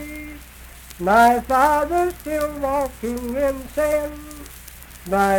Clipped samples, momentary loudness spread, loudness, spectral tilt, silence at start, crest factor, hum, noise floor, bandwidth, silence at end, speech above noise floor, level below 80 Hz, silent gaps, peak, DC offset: under 0.1%; 24 LU; -20 LUFS; -5 dB/octave; 0 s; 18 dB; none; -41 dBFS; 19 kHz; 0 s; 22 dB; -40 dBFS; none; -4 dBFS; under 0.1%